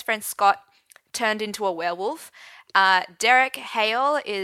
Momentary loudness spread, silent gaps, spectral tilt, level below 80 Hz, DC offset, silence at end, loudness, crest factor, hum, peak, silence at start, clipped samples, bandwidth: 12 LU; none; -1.5 dB/octave; -74 dBFS; under 0.1%; 0 s; -22 LUFS; 20 dB; none; -4 dBFS; 0 s; under 0.1%; 16.5 kHz